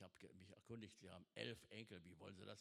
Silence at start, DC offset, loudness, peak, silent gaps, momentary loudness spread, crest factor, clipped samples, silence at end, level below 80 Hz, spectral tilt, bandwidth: 0 s; under 0.1%; -58 LUFS; -32 dBFS; none; 11 LU; 26 dB; under 0.1%; 0 s; -88 dBFS; -5 dB/octave; 13.5 kHz